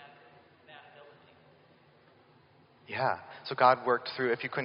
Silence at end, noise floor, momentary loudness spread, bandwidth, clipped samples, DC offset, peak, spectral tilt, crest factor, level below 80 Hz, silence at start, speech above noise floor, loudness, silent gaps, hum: 0 s; -62 dBFS; 27 LU; 5.4 kHz; under 0.1%; under 0.1%; -8 dBFS; -2.5 dB/octave; 26 dB; -80 dBFS; 0 s; 33 dB; -29 LUFS; none; none